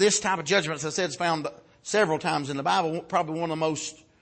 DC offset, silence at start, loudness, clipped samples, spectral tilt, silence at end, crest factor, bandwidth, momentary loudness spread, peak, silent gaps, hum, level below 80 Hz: under 0.1%; 0 s; -26 LUFS; under 0.1%; -3 dB/octave; 0.25 s; 16 dB; 8.8 kHz; 8 LU; -10 dBFS; none; none; -66 dBFS